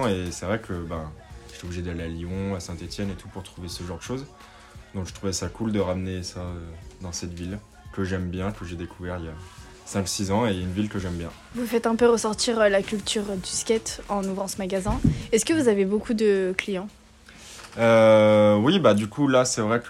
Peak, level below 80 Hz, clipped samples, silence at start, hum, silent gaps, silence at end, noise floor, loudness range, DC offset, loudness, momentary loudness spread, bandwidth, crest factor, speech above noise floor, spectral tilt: -4 dBFS; -46 dBFS; under 0.1%; 0 s; none; none; 0 s; -48 dBFS; 13 LU; under 0.1%; -24 LUFS; 19 LU; 16 kHz; 20 dB; 24 dB; -5 dB/octave